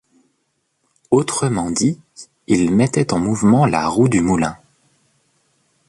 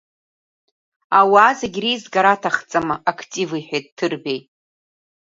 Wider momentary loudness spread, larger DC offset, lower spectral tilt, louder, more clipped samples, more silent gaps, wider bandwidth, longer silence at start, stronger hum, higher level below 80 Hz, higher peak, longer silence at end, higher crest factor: second, 6 LU vs 13 LU; neither; first, -6 dB/octave vs -3.5 dB/octave; about the same, -17 LUFS vs -18 LUFS; neither; second, none vs 3.92-3.97 s; first, 11.5 kHz vs 7.8 kHz; about the same, 1.1 s vs 1.1 s; neither; first, -46 dBFS vs -62 dBFS; about the same, -2 dBFS vs 0 dBFS; first, 1.35 s vs 1 s; about the same, 18 dB vs 20 dB